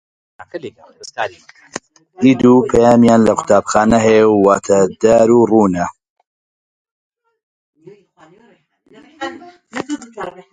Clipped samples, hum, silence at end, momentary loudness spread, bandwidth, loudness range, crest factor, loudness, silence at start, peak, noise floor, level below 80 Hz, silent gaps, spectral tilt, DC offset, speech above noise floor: under 0.1%; none; 0.2 s; 21 LU; 10.5 kHz; 20 LU; 16 dB; -12 LUFS; 0.4 s; 0 dBFS; -53 dBFS; -46 dBFS; 6.10-6.16 s, 6.27-6.85 s, 6.91-7.10 s, 7.43-7.73 s; -6 dB/octave; under 0.1%; 40 dB